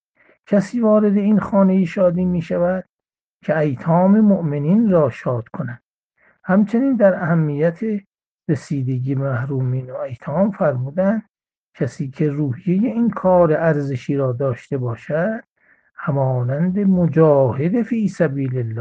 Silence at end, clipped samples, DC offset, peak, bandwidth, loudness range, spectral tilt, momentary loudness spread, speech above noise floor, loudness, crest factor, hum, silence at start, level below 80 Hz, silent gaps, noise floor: 0 s; under 0.1%; under 0.1%; -2 dBFS; 8 kHz; 4 LU; -9.5 dB/octave; 11 LU; 73 dB; -18 LUFS; 16 dB; none; 0.5 s; -56 dBFS; 2.89-2.97 s, 3.21-3.40 s, 5.86-6.09 s, 8.26-8.38 s, 11.29-11.34 s, 11.57-11.73 s; -90 dBFS